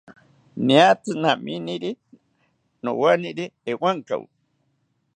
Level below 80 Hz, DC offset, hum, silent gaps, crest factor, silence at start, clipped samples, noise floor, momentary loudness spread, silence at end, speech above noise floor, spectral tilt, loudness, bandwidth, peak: -74 dBFS; under 0.1%; none; none; 22 dB; 0.1 s; under 0.1%; -70 dBFS; 16 LU; 0.95 s; 49 dB; -5.5 dB/octave; -22 LUFS; 9.6 kHz; -2 dBFS